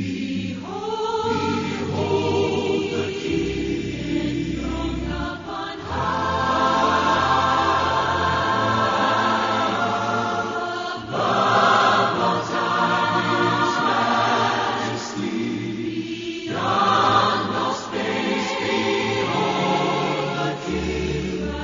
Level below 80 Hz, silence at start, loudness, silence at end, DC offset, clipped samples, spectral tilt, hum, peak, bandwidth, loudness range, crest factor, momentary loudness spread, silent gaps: -42 dBFS; 0 s; -21 LUFS; 0 s; under 0.1%; under 0.1%; -3 dB/octave; none; -4 dBFS; 7.4 kHz; 4 LU; 18 dB; 9 LU; none